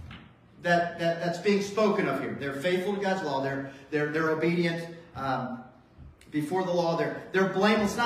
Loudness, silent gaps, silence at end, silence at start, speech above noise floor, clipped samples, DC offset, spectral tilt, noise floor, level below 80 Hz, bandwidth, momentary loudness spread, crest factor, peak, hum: -28 LUFS; none; 0 s; 0 s; 24 dB; under 0.1%; under 0.1%; -6 dB/octave; -51 dBFS; -60 dBFS; 15 kHz; 11 LU; 18 dB; -10 dBFS; none